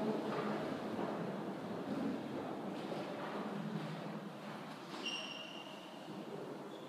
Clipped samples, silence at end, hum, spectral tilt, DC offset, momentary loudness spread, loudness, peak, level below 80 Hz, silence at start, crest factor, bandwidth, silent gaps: under 0.1%; 0 s; none; -5.5 dB/octave; under 0.1%; 8 LU; -43 LUFS; -26 dBFS; -82 dBFS; 0 s; 18 dB; 15.5 kHz; none